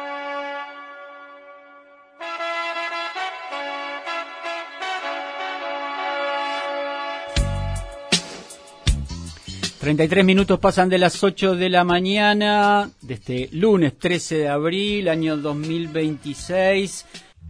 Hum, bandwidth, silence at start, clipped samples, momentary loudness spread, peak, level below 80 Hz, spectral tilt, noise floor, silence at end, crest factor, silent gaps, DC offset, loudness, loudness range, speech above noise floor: none; 11 kHz; 0 s; under 0.1%; 16 LU; -2 dBFS; -38 dBFS; -5 dB/octave; -48 dBFS; 0 s; 20 dB; none; under 0.1%; -21 LUFS; 11 LU; 29 dB